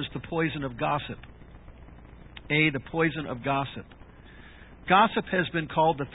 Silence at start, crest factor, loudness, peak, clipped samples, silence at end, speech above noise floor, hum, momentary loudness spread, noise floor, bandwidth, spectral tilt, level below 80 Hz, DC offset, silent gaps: 0 s; 22 dB; -26 LUFS; -6 dBFS; under 0.1%; 0 s; 22 dB; none; 20 LU; -49 dBFS; 4 kHz; -10 dB/octave; -52 dBFS; under 0.1%; none